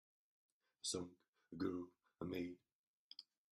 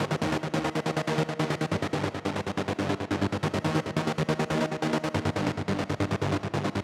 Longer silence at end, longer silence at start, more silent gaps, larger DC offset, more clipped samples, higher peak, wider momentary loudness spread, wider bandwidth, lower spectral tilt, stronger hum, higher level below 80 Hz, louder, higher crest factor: first, 0.3 s vs 0 s; first, 0.85 s vs 0 s; first, 1.28-1.33 s, 2.72-3.10 s vs none; neither; neither; second, -30 dBFS vs -10 dBFS; first, 15 LU vs 2 LU; second, 13 kHz vs 14.5 kHz; second, -4 dB/octave vs -6 dB/octave; neither; second, -82 dBFS vs -54 dBFS; second, -48 LUFS vs -29 LUFS; about the same, 20 dB vs 18 dB